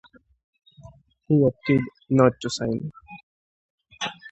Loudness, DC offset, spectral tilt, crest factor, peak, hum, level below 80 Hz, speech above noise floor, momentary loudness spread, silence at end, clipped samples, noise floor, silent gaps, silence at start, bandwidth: -23 LUFS; under 0.1%; -6.5 dB/octave; 22 dB; -2 dBFS; none; -56 dBFS; 29 dB; 13 LU; 0.05 s; under 0.1%; -50 dBFS; 3.23-3.78 s; 0.85 s; 8.2 kHz